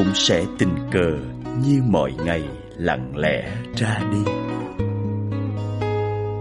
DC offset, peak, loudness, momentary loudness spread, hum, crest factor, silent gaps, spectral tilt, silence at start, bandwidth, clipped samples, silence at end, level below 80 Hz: under 0.1%; -4 dBFS; -22 LUFS; 8 LU; none; 18 dB; none; -5.5 dB/octave; 0 s; 11.5 kHz; under 0.1%; 0 s; -42 dBFS